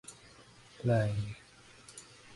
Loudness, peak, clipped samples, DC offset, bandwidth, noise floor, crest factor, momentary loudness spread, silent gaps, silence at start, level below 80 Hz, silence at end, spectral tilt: -33 LUFS; -18 dBFS; under 0.1%; under 0.1%; 11.5 kHz; -57 dBFS; 20 dB; 25 LU; none; 0.1 s; -60 dBFS; 0 s; -6.5 dB/octave